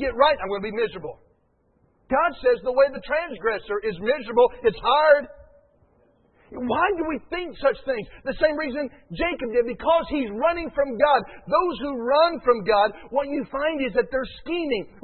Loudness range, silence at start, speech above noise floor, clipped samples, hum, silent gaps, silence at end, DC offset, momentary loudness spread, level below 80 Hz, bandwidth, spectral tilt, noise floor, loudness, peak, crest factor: 4 LU; 0 s; 42 dB; under 0.1%; none; none; 0.15 s; under 0.1%; 9 LU; -48 dBFS; 4.4 kHz; -9 dB/octave; -65 dBFS; -23 LUFS; -4 dBFS; 20 dB